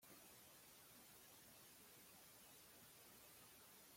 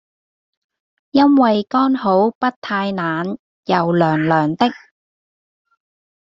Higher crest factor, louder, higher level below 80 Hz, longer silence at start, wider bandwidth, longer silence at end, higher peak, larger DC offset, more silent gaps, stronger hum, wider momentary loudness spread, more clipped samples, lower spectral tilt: about the same, 14 dB vs 18 dB; second, -63 LUFS vs -17 LUFS; second, -88 dBFS vs -60 dBFS; second, 0 s vs 1.15 s; first, 16.5 kHz vs 7.2 kHz; second, 0 s vs 1.5 s; second, -52 dBFS vs -2 dBFS; neither; second, none vs 2.35-2.41 s, 2.56-2.62 s, 3.39-3.63 s; neither; second, 1 LU vs 9 LU; neither; second, -1.5 dB/octave vs -8 dB/octave